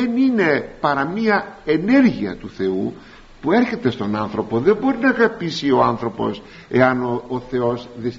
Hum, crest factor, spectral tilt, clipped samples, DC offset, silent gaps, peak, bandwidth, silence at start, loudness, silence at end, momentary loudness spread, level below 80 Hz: none; 18 dB; -5 dB/octave; under 0.1%; under 0.1%; none; -2 dBFS; 7.6 kHz; 0 s; -19 LUFS; 0 s; 9 LU; -50 dBFS